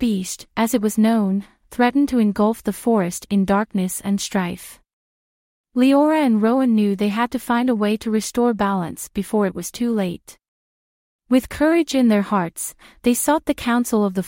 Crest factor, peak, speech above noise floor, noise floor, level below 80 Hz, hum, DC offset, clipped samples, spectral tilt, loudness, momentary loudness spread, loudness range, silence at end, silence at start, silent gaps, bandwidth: 16 dB; -4 dBFS; over 71 dB; under -90 dBFS; -50 dBFS; none; under 0.1%; under 0.1%; -5.5 dB/octave; -20 LUFS; 9 LU; 4 LU; 0 s; 0 s; 4.93-5.64 s, 10.48-11.19 s; 16.5 kHz